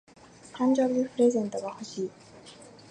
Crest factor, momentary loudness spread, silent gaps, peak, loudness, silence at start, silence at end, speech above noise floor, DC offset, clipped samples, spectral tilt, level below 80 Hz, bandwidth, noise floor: 16 dB; 24 LU; none; -12 dBFS; -28 LUFS; 0.55 s; 0.25 s; 23 dB; under 0.1%; under 0.1%; -5.5 dB/octave; -72 dBFS; 9.8 kHz; -50 dBFS